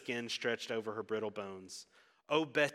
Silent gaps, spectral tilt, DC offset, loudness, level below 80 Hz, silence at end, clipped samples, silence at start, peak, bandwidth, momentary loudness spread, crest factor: none; -3.5 dB/octave; under 0.1%; -37 LUFS; -88 dBFS; 0 s; under 0.1%; 0 s; -16 dBFS; 14.5 kHz; 14 LU; 22 dB